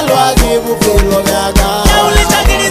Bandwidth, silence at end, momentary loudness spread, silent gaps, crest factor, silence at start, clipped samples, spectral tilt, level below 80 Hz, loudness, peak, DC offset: 16 kHz; 0 s; 3 LU; none; 10 dB; 0 s; under 0.1%; -3.5 dB/octave; -14 dBFS; -10 LUFS; 0 dBFS; under 0.1%